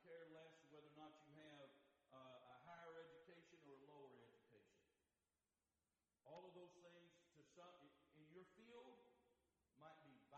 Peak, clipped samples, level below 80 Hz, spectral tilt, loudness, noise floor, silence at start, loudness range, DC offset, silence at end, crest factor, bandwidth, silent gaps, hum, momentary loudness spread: -50 dBFS; under 0.1%; under -90 dBFS; -5 dB/octave; -66 LUFS; under -90 dBFS; 0 s; 4 LU; under 0.1%; 0 s; 18 dB; 8.2 kHz; none; none; 6 LU